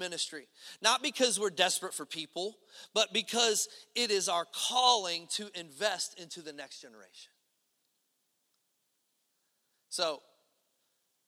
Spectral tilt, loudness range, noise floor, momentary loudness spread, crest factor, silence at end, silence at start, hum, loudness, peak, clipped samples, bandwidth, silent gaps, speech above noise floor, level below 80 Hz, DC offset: -0.5 dB/octave; 13 LU; -79 dBFS; 17 LU; 24 dB; 1.1 s; 0 s; none; -31 LUFS; -12 dBFS; under 0.1%; 17 kHz; none; 46 dB; -88 dBFS; under 0.1%